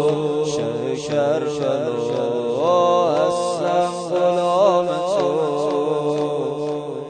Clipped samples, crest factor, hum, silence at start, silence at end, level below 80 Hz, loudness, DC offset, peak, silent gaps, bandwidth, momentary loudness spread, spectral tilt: under 0.1%; 16 dB; none; 0 s; 0 s; -62 dBFS; -20 LUFS; under 0.1%; -4 dBFS; none; 9.4 kHz; 7 LU; -5.5 dB/octave